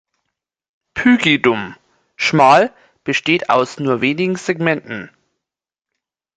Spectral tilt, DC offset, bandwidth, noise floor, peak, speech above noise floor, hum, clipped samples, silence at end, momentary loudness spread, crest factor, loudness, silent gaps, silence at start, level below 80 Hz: -5 dB/octave; under 0.1%; 9.2 kHz; -86 dBFS; 0 dBFS; 71 dB; none; under 0.1%; 1.3 s; 17 LU; 16 dB; -15 LUFS; none; 0.95 s; -58 dBFS